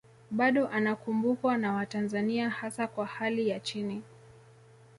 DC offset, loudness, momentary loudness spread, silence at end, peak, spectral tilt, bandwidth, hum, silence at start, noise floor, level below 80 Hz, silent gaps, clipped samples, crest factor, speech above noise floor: under 0.1%; -30 LUFS; 8 LU; 0.6 s; -14 dBFS; -5.5 dB/octave; 11.5 kHz; none; 0.3 s; -56 dBFS; -72 dBFS; none; under 0.1%; 18 dB; 27 dB